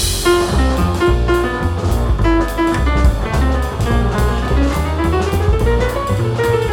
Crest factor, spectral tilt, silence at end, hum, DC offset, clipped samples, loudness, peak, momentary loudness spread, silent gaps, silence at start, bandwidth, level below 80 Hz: 14 dB; -6 dB/octave; 0 s; none; under 0.1%; under 0.1%; -16 LUFS; -2 dBFS; 3 LU; none; 0 s; 17 kHz; -18 dBFS